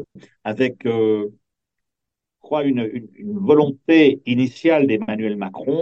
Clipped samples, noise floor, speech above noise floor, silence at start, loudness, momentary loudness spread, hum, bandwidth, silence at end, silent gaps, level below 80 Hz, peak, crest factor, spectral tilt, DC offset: under 0.1%; -84 dBFS; 65 dB; 0 s; -19 LUFS; 14 LU; none; 7.2 kHz; 0 s; none; -66 dBFS; -2 dBFS; 16 dB; -7.5 dB/octave; under 0.1%